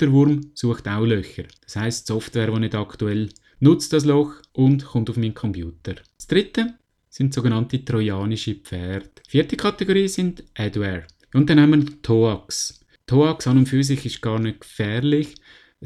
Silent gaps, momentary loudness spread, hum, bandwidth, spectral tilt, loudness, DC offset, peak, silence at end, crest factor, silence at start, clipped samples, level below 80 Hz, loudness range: none; 12 LU; none; 13.5 kHz; -6.5 dB/octave; -21 LUFS; under 0.1%; -2 dBFS; 0 s; 18 dB; 0 s; under 0.1%; -48 dBFS; 5 LU